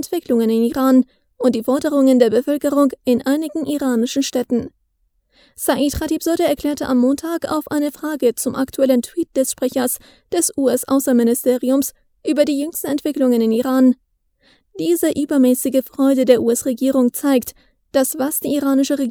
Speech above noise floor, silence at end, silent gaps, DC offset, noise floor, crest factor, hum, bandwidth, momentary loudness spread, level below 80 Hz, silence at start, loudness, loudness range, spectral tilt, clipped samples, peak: 48 dB; 0 s; none; under 0.1%; -65 dBFS; 18 dB; none; 20 kHz; 7 LU; -50 dBFS; 0 s; -18 LUFS; 3 LU; -4 dB/octave; under 0.1%; 0 dBFS